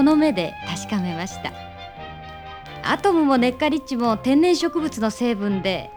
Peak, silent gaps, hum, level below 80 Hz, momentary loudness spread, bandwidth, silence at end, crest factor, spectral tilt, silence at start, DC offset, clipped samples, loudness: -6 dBFS; none; none; -48 dBFS; 19 LU; over 20 kHz; 0 s; 16 dB; -5 dB/octave; 0 s; under 0.1%; under 0.1%; -21 LUFS